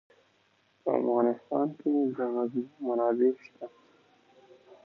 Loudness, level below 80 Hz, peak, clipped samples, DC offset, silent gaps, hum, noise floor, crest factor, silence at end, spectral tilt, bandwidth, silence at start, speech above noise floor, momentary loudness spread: -29 LUFS; -86 dBFS; -12 dBFS; under 0.1%; under 0.1%; none; none; -68 dBFS; 20 dB; 1.15 s; -9.5 dB/octave; 5.4 kHz; 0.85 s; 40 dB; 14 LU